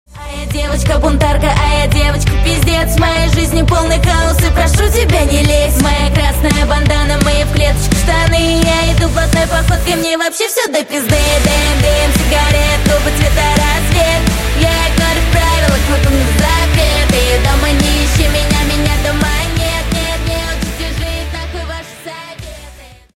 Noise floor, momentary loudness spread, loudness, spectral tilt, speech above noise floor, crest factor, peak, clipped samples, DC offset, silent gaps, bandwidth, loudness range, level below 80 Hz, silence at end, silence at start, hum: -35 dBFS; 8 LU; -12 LUFS; -4.5 dB/octave; 25 dB; 12 dB; 0 dBFS; under 0.1%; under 0.1%; none; 16.5 kHz; 3 LU; -16 dBFS; 0.25 s; 0.15 s; none